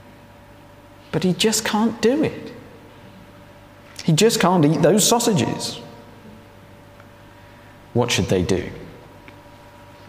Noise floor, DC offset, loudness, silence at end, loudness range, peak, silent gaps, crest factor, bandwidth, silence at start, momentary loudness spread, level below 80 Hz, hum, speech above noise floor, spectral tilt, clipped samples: -45 dBFS; under 0.1%; -19 LUFS; 1.1 s; 7 LU; -4 dBFS; none; 18 dB; 16 kHz; 1.15 s; 22 LU; -52 dBFS; 50 Hz at -45 dBFS; 27 dB; -4.5 dB/octave; under 0.1%